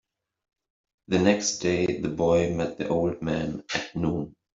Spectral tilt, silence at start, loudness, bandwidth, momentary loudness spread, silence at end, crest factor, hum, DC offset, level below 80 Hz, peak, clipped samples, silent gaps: -5 dB/octave; 1.1 s; -26 LUFS; 8 kHz; 7 LU; 0.25 s; 20 dB; none; under 0.1%; -54 dBFS; -6 dBFS; under 0.1%; none